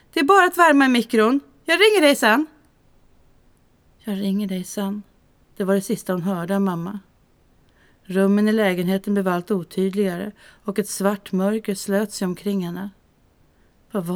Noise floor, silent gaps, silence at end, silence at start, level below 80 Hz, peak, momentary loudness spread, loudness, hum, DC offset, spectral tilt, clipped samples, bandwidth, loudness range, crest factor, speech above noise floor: -58 dBFS; none; 0 s; 0.15 s; -60 dBFS; -2 dBFS; 16 LU; -20 LUFS; none; under 0.1%; -5 dB/octave; under 0.1%; 19.5 kHz; 8 LU; 20 dB; 38 dB